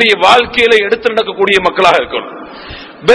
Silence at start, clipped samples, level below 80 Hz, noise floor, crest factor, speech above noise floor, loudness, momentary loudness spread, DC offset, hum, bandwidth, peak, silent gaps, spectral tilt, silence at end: 0 s; 2%; -42 dBFS; -29 dBFS; 10 dB; 19 dB; -10 LUFS; 20 LU; under 0.1%; none; 11 kHz; 0 dBFS; none; -3.5 dB/octave; 0 s